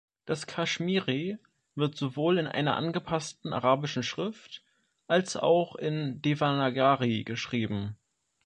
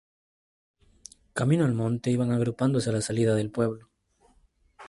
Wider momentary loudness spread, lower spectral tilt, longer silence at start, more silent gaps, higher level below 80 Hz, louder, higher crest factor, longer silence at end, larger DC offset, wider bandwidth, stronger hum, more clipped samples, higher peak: first, 10 LU vs 6 LU; about the same, -5.5 dB/octave vs -6.5 dB/octave; second, 0.25 s vs 1.35 s; neither; second, -66 dBFS vs -60 dBFS; second, -29 LUFS vs -26 LUFS; about the same, 20 dB vs 16 dB; first, 0.5 s vs 0 s; neither; about the same, 11 kHz vs 11.5 kHz; neither; neither; about the same, -10 dBFS vs -12 dBFS